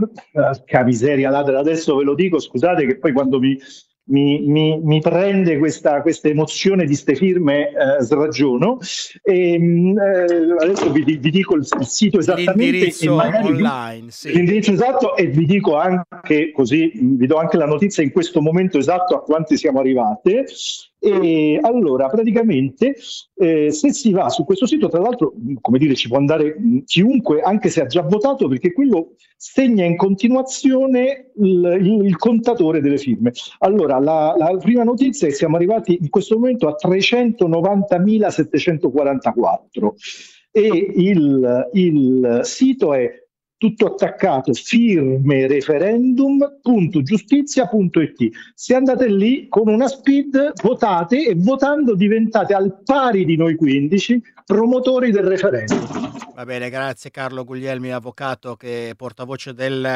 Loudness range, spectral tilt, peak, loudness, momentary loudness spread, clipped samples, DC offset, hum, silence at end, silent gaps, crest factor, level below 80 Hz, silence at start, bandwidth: 1 LU; -6 dB/octave; 0 dBFS; -16 LUFS; 7 LU; under 0.1%; under 0.1%; none; 0 s; none; 16 dB; -58 dBFS; 0 s; 10.5 kHz